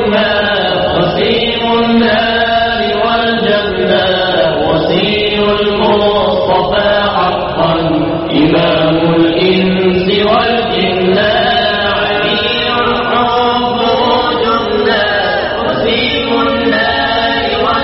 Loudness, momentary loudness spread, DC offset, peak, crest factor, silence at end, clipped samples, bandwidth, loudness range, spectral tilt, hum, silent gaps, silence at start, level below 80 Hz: -11 LUFS; 2 LU; under 0.1%; 0 dBFS; 10 dB; 0 s; under 0.1%; 6 kHz; 1 LU; -2.5 dB/octave; none; none; 0 s; -34 dBFS